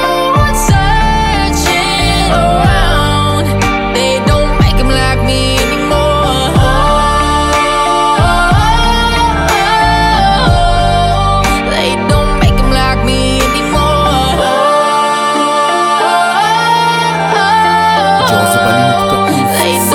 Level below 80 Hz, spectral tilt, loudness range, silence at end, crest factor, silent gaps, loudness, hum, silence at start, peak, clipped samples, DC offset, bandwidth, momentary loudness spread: -18 dBFS; -4.5 dB/octave; 1 LU; 0 s; 10 dB; none; -10 LUFS; none; 0 s; 0 dBFS; under 0.1%; under 0.1%; 19 kHz; 2 LU